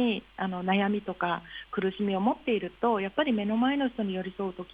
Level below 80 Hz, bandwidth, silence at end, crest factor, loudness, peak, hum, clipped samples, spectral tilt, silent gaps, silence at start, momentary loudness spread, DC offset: -60 dBFS; 4.9 kHz; 0.1 s; 16 dB; -29 LUFS; -12 dBFS; none; under 0.1%; -8.5 dB/octave; none; 0 s; 7 LU; under 0.1%